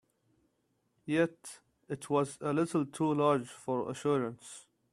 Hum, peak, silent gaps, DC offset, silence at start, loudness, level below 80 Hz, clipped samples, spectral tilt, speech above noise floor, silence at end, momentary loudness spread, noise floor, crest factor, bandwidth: none; -14 dBFS; none; under 0.1%; 1.05 s; -33 LUFS; -74 dBFS; under 0.1%; -6 dB/octave; 45 dB; 0.3 s; 20 LU; -77 dBFS; 20 dB; 13 kHz